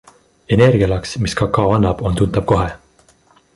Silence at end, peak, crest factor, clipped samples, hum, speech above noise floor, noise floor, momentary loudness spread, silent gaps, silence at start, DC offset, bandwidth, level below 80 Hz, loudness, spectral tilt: 0.8 s; -2 dBFS; 16 dB; under 0.1%; none; 38 dB; -53 dBFS; 7 LU; none; 0.5 s; under 0.1%; 11.5 kHz; -32 dBFS; -16 LUFS; -7 dB/octave